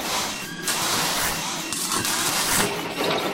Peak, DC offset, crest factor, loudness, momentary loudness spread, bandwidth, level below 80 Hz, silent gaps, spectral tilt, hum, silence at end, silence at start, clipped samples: -6 dBFS; 0.1%; 20 dB; -23 LUFS; 6 LU; 16.5 kHz; -50 dBFS; none; -1.5 dB/octave; none; 0 s; 0 s; under 0.1%